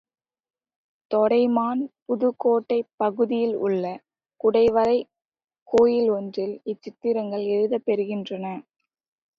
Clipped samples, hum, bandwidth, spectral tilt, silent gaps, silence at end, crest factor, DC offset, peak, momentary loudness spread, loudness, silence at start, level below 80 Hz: under 0.1%; none; 7 kHz; -7.5 dB/octave; 2.02-2.06 s, 2.94-2.98 s, 5.44-5.48 s, 5.62-5.66 s; 0.75 s; 16 dB; under 0.1%; -8 dBFS; 13 LU; -23 LUFS; 1.1 s; -64 dBFS